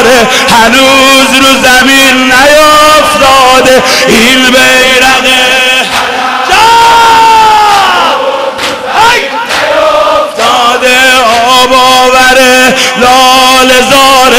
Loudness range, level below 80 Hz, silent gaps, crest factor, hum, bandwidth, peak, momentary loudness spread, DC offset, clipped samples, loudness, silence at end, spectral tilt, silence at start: 3 LU; -32 dBFS; none; 4 dB; none; over 20 kHz; 0 dBFS; 6 LU; under 0.1%; 7%; -3 LUFS; 0 s; -1.5 dB/octave; 0 s